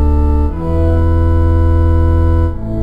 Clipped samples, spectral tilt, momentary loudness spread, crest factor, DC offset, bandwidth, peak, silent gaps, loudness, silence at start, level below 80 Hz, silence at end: under 0.1%; -10.5 dB/octave; 4 LU; 8 dB; under 0.1%; 3.2 kHz; -2 dBFS; none; -13 LUFS; 0 s; -12 dBFS; 0 s